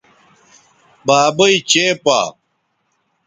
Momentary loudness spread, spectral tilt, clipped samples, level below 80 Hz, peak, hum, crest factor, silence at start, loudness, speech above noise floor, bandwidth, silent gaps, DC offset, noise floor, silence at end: 9 LU; -2.5 dB/octave; under 0.1%; -60 dBFS; 0 dBFS; none; 18 dB; 1.05 s; -14 LUFS; 54 dB; 9.8 kHz; none; under 0.1%; -67 dBFS; 0.95 s